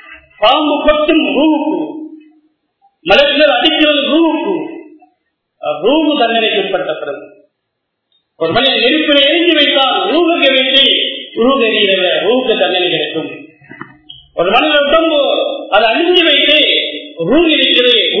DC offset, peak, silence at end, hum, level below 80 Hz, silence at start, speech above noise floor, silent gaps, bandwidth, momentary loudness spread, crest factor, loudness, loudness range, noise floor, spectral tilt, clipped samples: under 0.1%; 0 dBFS; 0 s; none; -44 dBFS; 0.1 s; 61 dB; none; 6 kHz; 13 LU; 12 dB; -10 LUFS; 5 LU; -71 dBFS; -5.5 dB/octave; 0.1%